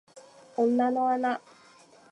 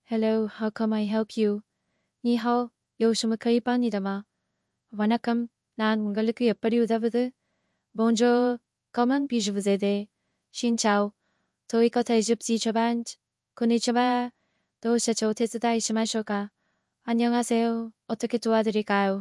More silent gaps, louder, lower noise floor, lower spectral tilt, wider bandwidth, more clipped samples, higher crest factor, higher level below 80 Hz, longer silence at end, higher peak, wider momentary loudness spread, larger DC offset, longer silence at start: neither; about the same, -27 LUFS vs -26 LUFS; second, -56 dBFS vs -79 dBFS; about the same, -5.5 dB/octave vs -4.5 dB/octave; second, 10.5 kHz vs 12 kHz; neither; about the same, 14 dB vs 16 dB; second, -86 dBFS vs -76 dBFS; first, 0.75 s vs 0 s; second, -14 dBFS vs -10 dBFS; about the same, 11 LU vs 9 LU; neither; about the same, 0.15 s vs 0.1 s